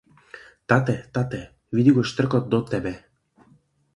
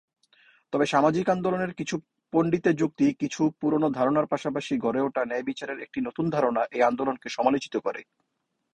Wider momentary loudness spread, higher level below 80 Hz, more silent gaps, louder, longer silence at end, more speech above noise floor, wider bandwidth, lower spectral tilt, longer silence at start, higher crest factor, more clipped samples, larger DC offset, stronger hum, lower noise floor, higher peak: first, 15 LU vs 9 LU; first, -54 dBFS vs -66 dBFS; neither; first, -23 LUFS vs -26 LUFS; first, 1 s vs 0.7 s; second, 38 dB vs 53 dB; first, 11 kHz vs 9.8 kHz; first, -7.5 dB/octave vs -6 dB/octave; second, 0.35 s vs 0.7 s; about the same, 20 dB vs 18 dB; neither; neither; neither; second, -59 dBFS vs -79 dBFS; first, -4 dBFS vs -8 dBFS